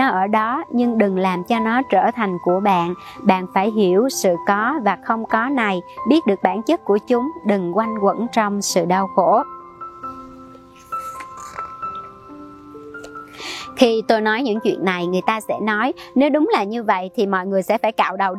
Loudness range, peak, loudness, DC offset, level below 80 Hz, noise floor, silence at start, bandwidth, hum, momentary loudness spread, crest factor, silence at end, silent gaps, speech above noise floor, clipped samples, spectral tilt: 8 LU; 0 dBFS; -19 LUFS; under 0.1%; -60 dBFS; -42 dBFS; 0 s; 15.5 kHz; none; 16 LU; 20 dB; 0 s; none; 24 dB; under 0.1%; -5 dB/octave